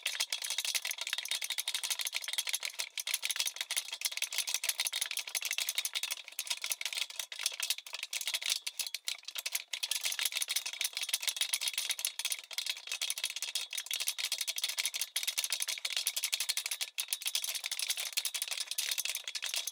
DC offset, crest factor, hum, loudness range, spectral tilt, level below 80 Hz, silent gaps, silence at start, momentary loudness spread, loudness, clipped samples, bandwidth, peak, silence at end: under 0.1%; 26 dB; none; 2 LU; 7 dB/octave; under -90 dBFS; none; 0 s; 4 LU; -34 LUFS; under 0.1%; 19 kHz; -10 dBFS; 0 s